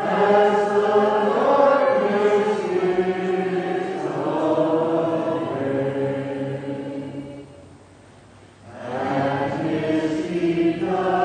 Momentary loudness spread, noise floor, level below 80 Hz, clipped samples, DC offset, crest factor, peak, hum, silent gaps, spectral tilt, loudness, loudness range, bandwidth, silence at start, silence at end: 12 LU; -47 dBFS; -60 dBFS; under 0.1%; under 0.1%; 18 dB; -4 dBFS; none; none; -7 dB/octave; -21 LUFS; 10 LU; 9.6 kHz; 0 s; 0 s